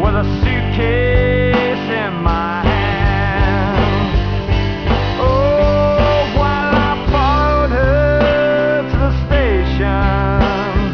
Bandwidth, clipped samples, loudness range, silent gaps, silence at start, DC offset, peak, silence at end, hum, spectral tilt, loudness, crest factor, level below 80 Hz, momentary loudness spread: 5.4 kHz; under 0.1%; 2 LU; none; 0 s; 0.5%; -2 dBFS; 0 s; none; -8 dB/octave; -15 LUFS; 12 dB; -20 dBFS; 4 LU